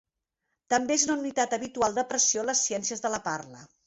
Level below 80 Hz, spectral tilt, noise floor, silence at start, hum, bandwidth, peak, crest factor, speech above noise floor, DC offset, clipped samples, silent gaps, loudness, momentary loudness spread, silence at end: -66 dBFS; -1.5 dB/octave; -82 dBFS; 0.7 s; none; 8.4 kHz; -10 dBFS; 20 dB; 54 dB; under 0.1%; under 0.1%; none; -27 LUFS; 8 LU; 0.2 s